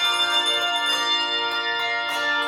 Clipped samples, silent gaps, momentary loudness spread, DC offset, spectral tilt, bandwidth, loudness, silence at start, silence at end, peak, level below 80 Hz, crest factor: under 0.1%; none; 4 LU; under 0.1%; 0.5 dB/octave; 16.5 kHz; -21 LUFS; 0 s; 0 s; -10 dBFS; -70 dBFS; 14 dB